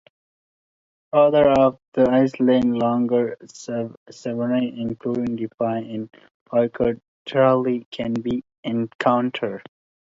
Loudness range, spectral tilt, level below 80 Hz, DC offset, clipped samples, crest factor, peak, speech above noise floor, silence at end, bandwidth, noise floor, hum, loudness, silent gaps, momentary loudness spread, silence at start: 6 LU; -7 dB/octave; -56 dBFS; under 0.1%; under 0.1%; 18 dB; -4 dBFS; over 69 dB; 0.5 s; 7.6 kHz; under -90 dBFS; none; -21 LUFS; 1.88-1.92 s, 3.97-4.06 s, 5.54-5.58 s, 6.31-6.46 s, 7.08-7.26 s, 7.86-7.92 s, 8.58-8.63 s, 8.95-8.99 s; 13 LU; 1.15 s